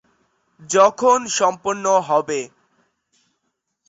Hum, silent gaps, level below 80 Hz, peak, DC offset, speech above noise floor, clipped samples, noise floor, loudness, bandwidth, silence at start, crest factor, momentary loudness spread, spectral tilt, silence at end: none; none; -66 dBFS; -2 dBFS; under 0.1%; 57 dB; under 0.1%; -74 dBFS; -18 LUFS; 8.2 kHz; 0.6 s; 18 dB; 12 LU; -3 dB/octave; 1.4 s